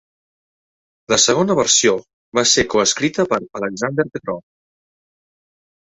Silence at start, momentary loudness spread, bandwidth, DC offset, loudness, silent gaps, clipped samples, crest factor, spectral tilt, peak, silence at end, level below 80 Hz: 1.1 s; 12 LU; 8.4 kHz; under 0.1%; -16 LUFS; 2.13-2.32 s; under 0.1%; 18 dB; -2.5 dB/octave; -2 dBFS; 1.55 s; -52 dBFS